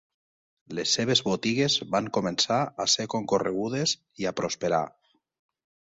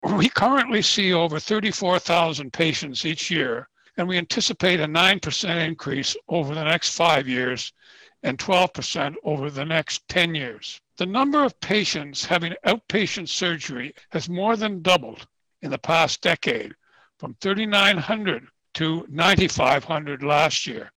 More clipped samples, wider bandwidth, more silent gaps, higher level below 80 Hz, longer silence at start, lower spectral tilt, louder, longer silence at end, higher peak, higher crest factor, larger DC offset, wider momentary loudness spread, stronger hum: neither; second, 8.2 kHz vs 18.5 kHz; neither; second, -64 dBFS vs -54 dBFS; first, 0.7 s vs 0 s; about the same, -3.5 dB/octave vs -3.5 dB/octave; second, -26 LUFS vs -22 LUFS; first, 1.05 s vs 0.1 s; about the same, -8 dBFS vs -8 dBFS; about the same, 20 dB vs 16 dB; neither; second, 7 LU vs 12 LU; neither